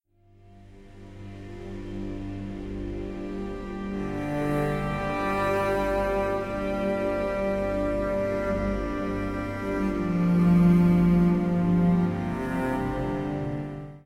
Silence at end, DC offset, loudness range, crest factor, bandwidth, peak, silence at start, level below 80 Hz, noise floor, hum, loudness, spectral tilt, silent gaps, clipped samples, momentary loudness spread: 0.05 s; under 0.1%; 12 LU; 16 dB; 11 kHz; -12 dBFS; 0.5 s; -40 dBFS; -56 dBFS; 50 Hz at -45 dBFS; -26 LUFS; -8.5 dB/octave; none; under 0.1%; 15 LU